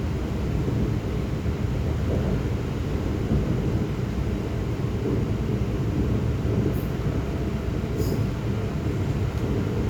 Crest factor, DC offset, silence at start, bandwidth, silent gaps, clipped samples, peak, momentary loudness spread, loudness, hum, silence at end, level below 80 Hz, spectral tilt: 14 dB; under 0.1%; 0 s; 19.5 kHz; none; under 0.1%; -12 dBFS; 3 LU; -26 LUFS; none; 0 s; -32 dBFS; -8 dB/octave